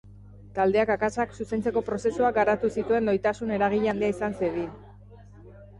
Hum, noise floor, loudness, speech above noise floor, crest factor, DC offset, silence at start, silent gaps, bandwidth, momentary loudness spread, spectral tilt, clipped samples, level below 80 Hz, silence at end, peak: 50 Hz at -45 dBFS; -48 dBFS; -26 LUFS; 23 dB; 14 dB; under 0.1%; 0.05 s; none; 11 kHz; 6 LU; -6.5 dB/octave; under 0.1%; -52 dBFS; 0 s; -12 dBFS